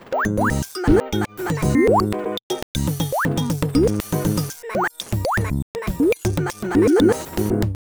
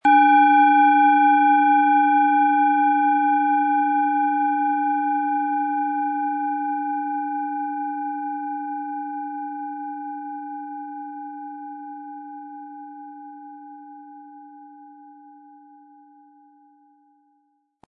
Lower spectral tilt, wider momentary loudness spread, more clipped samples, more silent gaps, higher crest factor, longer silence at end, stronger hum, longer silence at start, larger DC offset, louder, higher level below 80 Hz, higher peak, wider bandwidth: about the same, -6 dB/octave vs -5 dB/octave; second, 9 LU vs 23 LU; neither; first, 2.43-2.50 s, 2.63-2.75 s, 5.62-5.74 s vs none; about the same, 18 dB vs 16 dB; second, 0.25 s vs 2.75 s; neither; about the same, 0 s vs 0.05 s; neither; about the same, -21 LUFS vs -20 LUFS; first, -34 dBFS vs -80 dBFS; first, -2 dBFS vs -6 dBFS; first, over 20 kHz vs 3.6 kHz